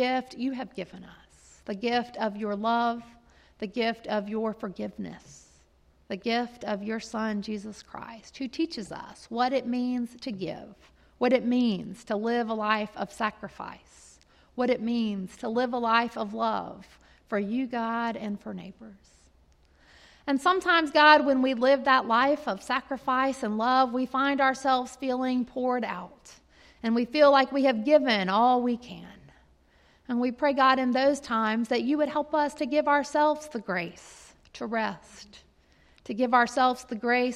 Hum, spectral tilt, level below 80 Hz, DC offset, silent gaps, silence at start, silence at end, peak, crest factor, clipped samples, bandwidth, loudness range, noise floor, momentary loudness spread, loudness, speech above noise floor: none; -4.5 dB/octave; -64 dBFS; under 0.1%; none; 0 s; 0 s; -6 dBFS; 22 dB; under 0.1%; 12 kHz; 10 LU; -62 dBFS; 17 LU; -26 LUFS; 35 dB